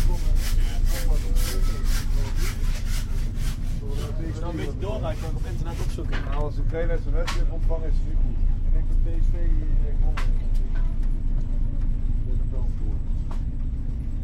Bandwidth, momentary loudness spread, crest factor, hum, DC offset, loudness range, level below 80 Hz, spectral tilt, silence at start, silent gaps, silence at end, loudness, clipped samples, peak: 14.5 kHz; 4 LU; 12 dB; none; under 0.1%; 2 LU; -22 dBFS; -6 dB/octave; 0 s; none; 0 s; -29 LUFS; under 0.1%; -10 dBFS